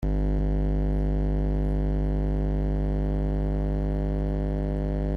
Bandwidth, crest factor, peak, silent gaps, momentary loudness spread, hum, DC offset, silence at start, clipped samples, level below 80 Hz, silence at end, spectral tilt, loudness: 3.4 kHz; 10 dB; -14 dBFS; none; 2 LU; 50 Hz at -25 dBFS; under 0.1%; 0 s; under 0.1%; -26 dBFS; 0 s; -10.5 dB/octave; -28 LUFS